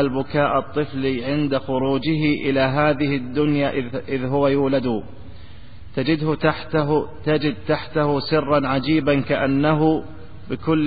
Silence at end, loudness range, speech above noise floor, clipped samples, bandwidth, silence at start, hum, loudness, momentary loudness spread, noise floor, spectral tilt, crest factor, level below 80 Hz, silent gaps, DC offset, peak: 0 s; 3 LU; 22 dB; under 0.1%; 4.9 kHz; 0 s; none; -21 LUFS; 7 LU; -42 dBFS; -12 dB/octave; 16 dB; -46 dBFS; none; 2%; -4 dBFS